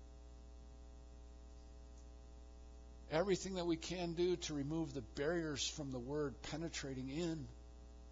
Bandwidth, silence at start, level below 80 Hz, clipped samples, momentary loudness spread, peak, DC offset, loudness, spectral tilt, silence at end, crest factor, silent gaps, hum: 7.4 kHz; 0 s; -56 dBFS; under 0.1%; 20 LU; -24 dBFS; under 0.1%; -42 LUFS; -5 dB/octave; 0 s; 20 dB; none; none